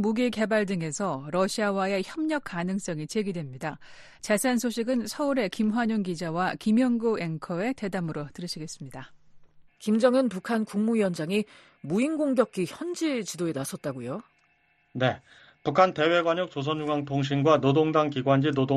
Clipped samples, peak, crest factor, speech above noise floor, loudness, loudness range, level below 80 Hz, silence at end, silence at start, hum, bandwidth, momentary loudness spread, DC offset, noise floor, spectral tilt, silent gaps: under 0.1%; -6 dBFS; 20 dB; 40 dB; -27 LUFS; 5 LU; -64 dBFS; 0 s; 0 s; none; 12.5 kHz; 13 LU; under 0.1%; -67 dBFS; -5.5 dB/octave; none